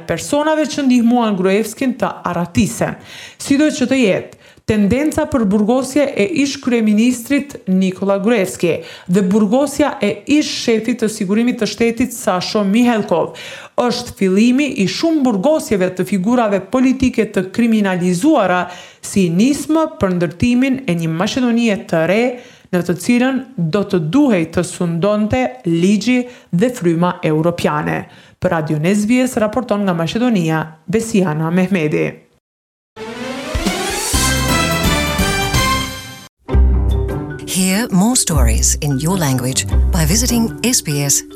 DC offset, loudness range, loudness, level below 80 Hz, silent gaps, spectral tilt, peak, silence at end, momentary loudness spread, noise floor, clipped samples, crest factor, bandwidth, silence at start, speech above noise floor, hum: under 0.1%; 2 LU; -16 LUFS; -28 dBFS; 32.40-32.96 s, 36.29-36.37 s; -5 dB/octave; -2 dBFS; 0 s; 7 LU; under -90 dBFS; under 0.1%; 14 dB; 17 kHz; 0 s; over 75 dB; none